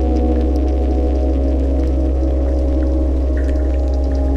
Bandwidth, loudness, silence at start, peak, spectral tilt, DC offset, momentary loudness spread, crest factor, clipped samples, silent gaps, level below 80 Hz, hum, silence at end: 5.6 kHz; -18 LUFS; 0 s; -6 dBFS; -9.5 dB/octave; under 0.1%; 1 LU; 8 dB; under 0.1%; none; -16 dBFS; none; 0 s